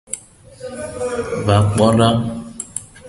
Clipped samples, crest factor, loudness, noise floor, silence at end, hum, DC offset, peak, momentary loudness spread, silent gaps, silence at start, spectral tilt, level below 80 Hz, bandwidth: under 0.1%; 18 dB; -17 LUFS; -40 dBFS; 0 s; none; under 0.1%; 0 dBFS; 16 LU; none; 0.1 s; -6 dB/octave; -40 dBFS; 11.5 kHz